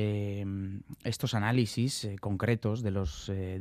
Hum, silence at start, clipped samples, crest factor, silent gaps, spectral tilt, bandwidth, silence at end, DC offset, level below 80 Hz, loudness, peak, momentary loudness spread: none; 0 s; under 0.1%; 18 dB; none; -6 dB/octave; 14.5 kHz; 0 s; under 0.1%; -50 dBFS; -32 LUFS; -12 dBFS; 8 LU